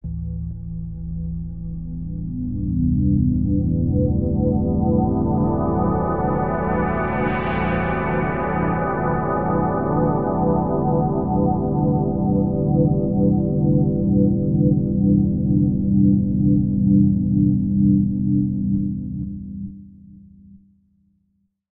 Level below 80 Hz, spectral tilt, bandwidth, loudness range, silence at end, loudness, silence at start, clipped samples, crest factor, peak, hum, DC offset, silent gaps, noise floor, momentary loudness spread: -32 dBFS; -13.5 dB/octave; 3.7 kHz; 5 LU; 1.15 s; -20 LUFS; 0.05 s; under 0.1%; 16 dB; -4 dBFS; none; 0.6%; none; -68 dBFS; 12 LU